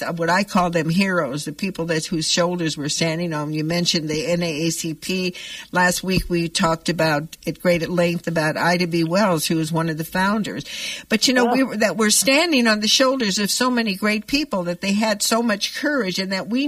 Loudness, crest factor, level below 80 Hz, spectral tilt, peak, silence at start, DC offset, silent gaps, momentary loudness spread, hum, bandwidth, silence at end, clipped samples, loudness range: -20 LUFS; 18 dB; -48 dBFS; -4 dB/octave; -4 dBFS; 0 s; under 0.1%; none; 8 LU; none; 15.5 kHz; 0 s; under 0.1%; 4 LU